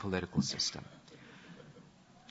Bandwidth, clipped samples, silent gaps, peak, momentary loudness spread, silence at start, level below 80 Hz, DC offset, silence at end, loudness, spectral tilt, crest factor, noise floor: 8 kHz; under 0.1%; none; -18 dBFS; 22 LU; 0 s; -66 dBFS; under 0.1%; 0.45 s; -34 LUFS; -4 dB/octave; 22 dB; -59 dBFS